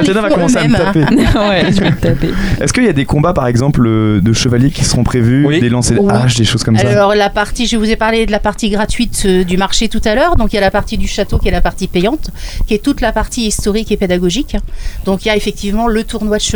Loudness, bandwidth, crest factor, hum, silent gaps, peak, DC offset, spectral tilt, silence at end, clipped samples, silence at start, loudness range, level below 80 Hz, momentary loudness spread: -12 LUFS; over 20 kHz; 12 dB; none; none; 0 dBFS; under 0.1%; -5 dB/octave; 0 s; under 0.1%; 0 s; 4 LU; -22 dBFS; 6 LU